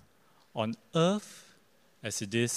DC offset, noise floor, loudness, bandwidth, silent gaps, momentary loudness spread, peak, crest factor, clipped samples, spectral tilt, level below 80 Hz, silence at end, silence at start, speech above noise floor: under 0.1%; -66 dBFS; -32 LUFS; 15.5 kHz; none; 17 LU; -14 dBFS; 20 dB; under 0.1%; -4.5 dB/octave; -76 dBFS; 0 s; 0.55 s; 35 dB